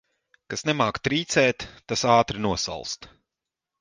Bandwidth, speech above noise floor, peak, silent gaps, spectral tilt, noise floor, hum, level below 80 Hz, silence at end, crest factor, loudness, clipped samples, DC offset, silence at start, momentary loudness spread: 11 kHz; 63 dB; -6 dBFS; none; -4 dB/octave; -87 dBFS; none; -52 dBFS; 0.75 s; 20 dB; -24 LUFS; under 0.1%; under 0.1%; 0.5 s; 14 LU